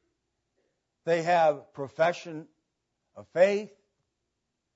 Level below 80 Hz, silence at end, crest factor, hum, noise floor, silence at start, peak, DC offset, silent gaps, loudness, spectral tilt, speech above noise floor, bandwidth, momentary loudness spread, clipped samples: -82 dBFS; 1.1 s; 20 dB; none; -82 dBFS; 1.05 s; -10 dBFS; under 0.1%; none; -26 LUFS; -5.5 dB/octave; 55 dB; 8 kHz; 17 LU; under 0.1%